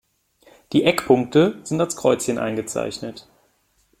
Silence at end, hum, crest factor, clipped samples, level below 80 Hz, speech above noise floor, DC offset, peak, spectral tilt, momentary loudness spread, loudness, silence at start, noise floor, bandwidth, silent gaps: 0.8 s; none; 20 dB; under 0.1%; -58 dBFS; 44 dB; under 0.1%; -2 dBFS; -5 dB/octave; 10 LU; -20 LUFS; 0.7 s; -64 dBFS; 16.5 kHz; none